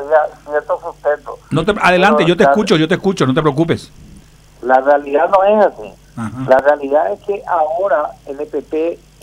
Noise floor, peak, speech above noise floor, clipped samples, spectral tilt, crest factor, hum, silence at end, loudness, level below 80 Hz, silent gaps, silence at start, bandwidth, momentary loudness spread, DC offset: -42 dBFS; 0 dBFS; 28 dB; under 0.1%; -6 dB/octave; 14 dB; none; 0.25 s; -14 LUFS; -44 dBFS; none; 0 s; 12.5 kHz; 13 LU; under 0.1%